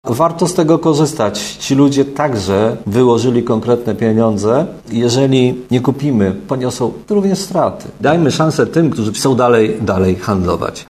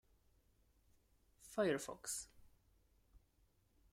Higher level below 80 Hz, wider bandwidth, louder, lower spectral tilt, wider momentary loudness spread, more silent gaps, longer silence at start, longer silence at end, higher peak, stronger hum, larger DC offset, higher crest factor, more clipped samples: first, -44 dBFS vs -74 dBFS; second, 14.5 kHz vs 16 kHz; first, -14 LUFS vs -43 LUFS; first, -6 dB/octave vs -3.5 dB/octave; second, 6 LU vs 10 LU; neither; second, 0.05 s vs 1.4 s; second, 0.05 s vs 0.75 s; first, 0 dBFS vs -26 dBFS; neither; neither; second, 14 dB vs 22 dB; neither